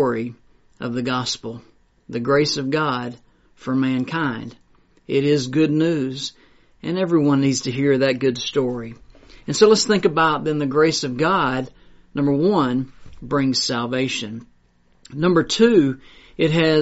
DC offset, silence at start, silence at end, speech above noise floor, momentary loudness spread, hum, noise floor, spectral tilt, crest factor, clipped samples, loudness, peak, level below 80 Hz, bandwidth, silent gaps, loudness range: under 0.1%; 0 s; 0 s; 38 dB; 17 LU; none; -57 dBFS; -4.5 dB/octave; 18 dB; under 0.1%; -20 LUFS; -2 dBFS; -54 dBFS; 8 kHz; none; 4 LU